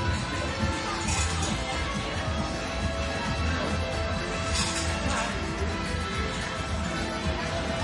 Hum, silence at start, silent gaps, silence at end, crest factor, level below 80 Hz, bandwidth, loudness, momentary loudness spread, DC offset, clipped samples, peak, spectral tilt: none; 0 s; none; 0 s; 14 dB; -38 dBFS; 11.5 kHz; -29 LUFS; 3 LU; under 0.1%; under 0.1%; -14 dBFS; -4 dB/octave